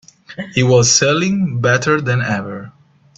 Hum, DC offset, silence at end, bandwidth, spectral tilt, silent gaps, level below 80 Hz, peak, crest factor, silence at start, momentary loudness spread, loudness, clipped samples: none; under 0.1%; 0.45 s; 8.4 kHz; -4 dB/octave; none; -50 dBFS; 0 dBFS; 16 dB; 0.3 s; 19 LU; -14 LUFS; under 0.1%